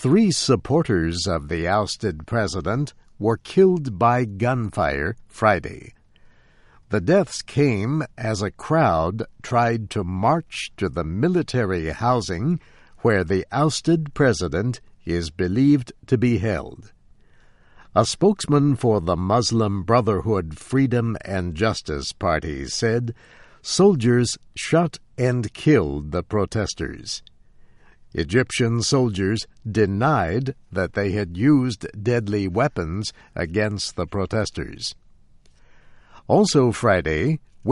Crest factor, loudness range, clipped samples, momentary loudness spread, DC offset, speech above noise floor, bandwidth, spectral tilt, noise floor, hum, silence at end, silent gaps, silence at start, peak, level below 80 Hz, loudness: 18 dB; 3 LU; under 0.1%; 9 LU; under 0.1%; 31 dB; 11.5 kHz; -6 dB/octave; -52 dBFS; none; 0 s; none; 0 s; -4 dBFS; -44 dBFS; -22 LUFS